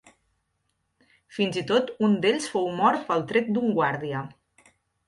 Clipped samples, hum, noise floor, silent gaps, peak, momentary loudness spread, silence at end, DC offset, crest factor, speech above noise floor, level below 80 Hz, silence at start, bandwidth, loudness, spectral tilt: under 0.1%; none; -75 dBFS; none; -8 dBFS; 10 LU; 0.75 s; under 0.1%; 18 dB; 51 dB; -68 dBFS; 1.3 s; 11.5 kHz; -25 LUFS; -5.5 dB/octave